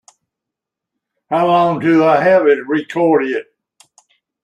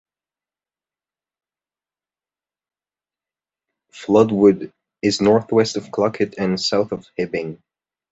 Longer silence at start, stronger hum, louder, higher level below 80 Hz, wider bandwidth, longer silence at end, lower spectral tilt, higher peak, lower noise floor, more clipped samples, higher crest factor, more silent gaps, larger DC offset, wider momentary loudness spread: second, 1.3 s vs 3.95 s; neither; first, -14 LUFS vs -19 LUFS; about the same, -62 dBFS vs -58 dBFS; first, 9.4 kHz vs 8.2 kHz; first, 1 s vs 0.55 s; first, -7 dB/octave vs -5.5 dB/octave; about the same, -2 dBFS vs -2 dBFS; second, -83 dBFS vs under -90 dBFS; neither; second, 14 dB vs 20 dB; neither; neither; about the same, 9 LU vs 11 LU